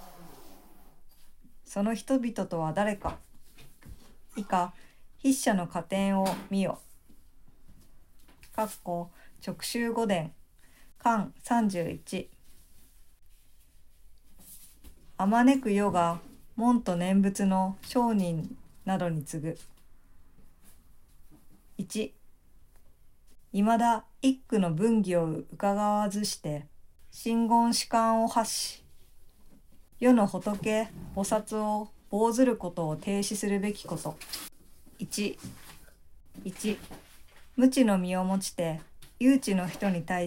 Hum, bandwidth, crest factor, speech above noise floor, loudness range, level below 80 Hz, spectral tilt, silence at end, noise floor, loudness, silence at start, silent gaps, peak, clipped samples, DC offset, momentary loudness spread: none; 16 kHz; 20 dB; 27 dB; 10 LU; -56 dBFS; -5.5 dB/octave; 0 s; -54 dBFS; -29 LUFS; 0 s; none; -10 dBFS; under 0.1%; under 0.1%; 16 LU